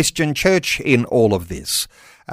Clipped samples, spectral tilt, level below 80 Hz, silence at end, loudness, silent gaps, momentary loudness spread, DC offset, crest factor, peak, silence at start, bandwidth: under 0.1%; -4 dB/octave; -42 dBFS; 0 s; -17 LUFS; none; 6 LU; under 0.1%; 16 dB; -2 dBFS; 0 s; 16 kHz